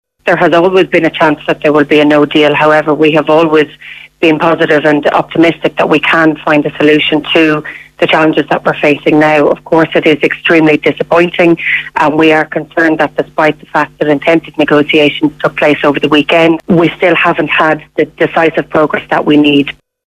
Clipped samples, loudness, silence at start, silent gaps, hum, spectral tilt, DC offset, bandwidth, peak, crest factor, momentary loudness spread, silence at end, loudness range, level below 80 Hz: 0.8%; -9 LUFS; 0.25 s; none; none; -6.5 dB/octave; under 0.1%; 11 kHz; 0 dBFS; 10 dB; 5 LU; 0.35 s; 2 LU; -46 dBFS